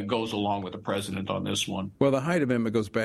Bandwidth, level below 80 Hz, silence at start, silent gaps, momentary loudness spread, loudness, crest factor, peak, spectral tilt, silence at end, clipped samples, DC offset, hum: 13.5 kHz; -60 dBFS; 0 s; none; 6 LU; -28 LUFS; 20 dB; -8 dBFS; -5 dB/octave; 0 s; under 0.1%; under 0.1%; none